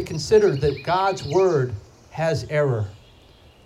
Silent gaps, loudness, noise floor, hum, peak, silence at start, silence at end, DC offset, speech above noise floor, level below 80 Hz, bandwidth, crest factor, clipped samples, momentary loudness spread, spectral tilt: none; -21 LUFS; -50 dBFS; none; -6 dBFS; 0 s; 0.7 s; under 0.1%; 30 dB; -46 dBFS; 12.5 kHz; 16 dB; under 0.1%; 12 LU; -6 dB/octave